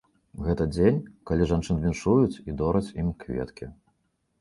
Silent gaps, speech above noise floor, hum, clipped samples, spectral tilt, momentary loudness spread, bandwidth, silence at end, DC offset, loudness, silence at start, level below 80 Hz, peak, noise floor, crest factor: none; 48 dB; none; under 0.1%; -8 dB/octave; 11 LU; 11.5 kHz; 0.7 s; under 0.1%; -26 LUFS; 0.35 s; -40 dBFS; -8 dBFS; -73 dBFS; 18 dB